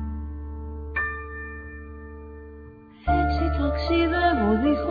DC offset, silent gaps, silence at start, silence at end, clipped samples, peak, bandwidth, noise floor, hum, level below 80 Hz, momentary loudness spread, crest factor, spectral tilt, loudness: under 0.1%; none; 0 s; 0 s; under 0.1%; -10 dBFS; 5 kHz; -45 dBFS; none; -32 dBFS; 20 LU; 16 dB; -9 dB/octave; -25 LUFS